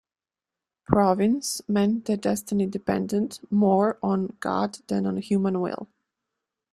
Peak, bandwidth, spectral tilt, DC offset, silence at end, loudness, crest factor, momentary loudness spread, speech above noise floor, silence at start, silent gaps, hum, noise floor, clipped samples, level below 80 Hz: -4 dBFS; 14 kHz; -6 dB/octave; under 0.1%; 0.85 s; -25 LUFS; 22 dB; 7 LU; over 66 dB; 0.9 s; none; none; under -90 dBFS; under 0.1%; -58 dBFS